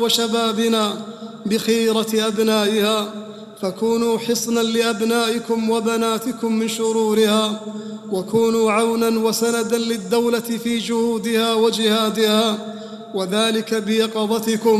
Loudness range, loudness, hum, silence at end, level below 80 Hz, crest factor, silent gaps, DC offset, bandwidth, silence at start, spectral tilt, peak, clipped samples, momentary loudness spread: 1 LU; -19 LUFS; none; 0 s; -62 dBFS; 18 dB; none; under 0.1%; 15 kHz; 0 s; -4 dB/octave; -2 dBFS; under 0.1%; 10 LU